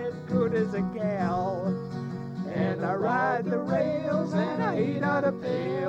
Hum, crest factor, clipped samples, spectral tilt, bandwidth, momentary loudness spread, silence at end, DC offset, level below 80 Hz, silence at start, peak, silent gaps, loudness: none; 14 dB; under 0.1%; -8.5 dB/octave; 7.8 kHz; 7 LU; 0 s; under 0.1%; -60 dBFS; 0 s; -12 dBFS; none; -28 LUFS